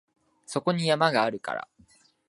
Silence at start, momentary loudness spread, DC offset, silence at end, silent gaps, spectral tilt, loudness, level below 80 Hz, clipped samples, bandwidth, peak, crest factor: 0.5 s; 12 LU; under 0.1%; 0.7 s; none; -5 dB/octave; -26 LUFS; -74 dBFS; under 0.1%; 11.5 kHz; -6 dBFS; 22 dB